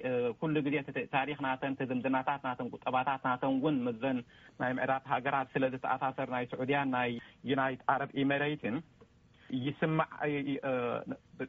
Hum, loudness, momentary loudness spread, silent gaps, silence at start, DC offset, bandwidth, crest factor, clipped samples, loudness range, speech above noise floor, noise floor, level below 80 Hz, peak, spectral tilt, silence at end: none; -34 LUFS; 6 LU; none; 0 s; under 0.1%; 4 kHz; 20 dB; under 0.1%; 1 LU; 28 dB; -62 dBFS; -70 dBFS; -14 dBFS; -4.5 dB/octave; 0 s